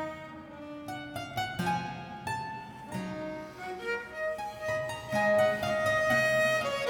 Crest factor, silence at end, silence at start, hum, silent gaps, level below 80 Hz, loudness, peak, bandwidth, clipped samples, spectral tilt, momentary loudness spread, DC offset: 16 dB; 0 s; 0 s; none; none; -60 dBFS; -31 LUFS; -16 dBFS; 19 kHz; under 0.1%; -4.5 dB/octave; 15 LU; under 0.1%